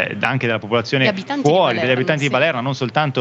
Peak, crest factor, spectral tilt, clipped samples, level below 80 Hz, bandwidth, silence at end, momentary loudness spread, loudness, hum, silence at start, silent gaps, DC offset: 0 dBFS; 18 dB; -5.5 dB/octave; under 0.1%; -66 dBFS; 8.2 kHz; 0 s; 4 LU; -17 LUFS; none; 0 s; none; under 0.1%